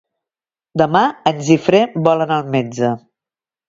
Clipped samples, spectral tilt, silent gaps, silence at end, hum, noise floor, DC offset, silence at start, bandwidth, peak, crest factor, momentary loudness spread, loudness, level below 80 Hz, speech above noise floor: under 0.1%; -6 dB/octave; none; 0.7 s; none; under -90 dBFS; under 0.1%; 0.75 s; 7.8 kHz; 0 dBFS; 16 dB; 7 LU; -16 LUFS; -56 dBFS; over 75 dB